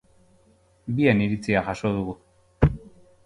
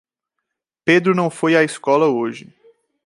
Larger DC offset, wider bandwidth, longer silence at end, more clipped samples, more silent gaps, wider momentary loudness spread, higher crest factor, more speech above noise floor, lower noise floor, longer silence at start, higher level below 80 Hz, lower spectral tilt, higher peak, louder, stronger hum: neither; about the same, 11 kHz vs 11.5 kHz; second, 0.45 s vs 0.65 s; neither; neither; first, 19 LU vs 10 LU; about the same, 22 dB vs 18 dB; second, 37 dB vs 63 dB; second, -60 dBFS vs -79 dBFS; about the same, 0.85 s vs 0.85 s; first, -40 dBFS vs -70 dBFS; first, -8 dB/octave vs -5.5 dB/octave; about the same, -4 dBFS vs -2 dBFS; second, -24 LUFS vs -17 LUFS; neither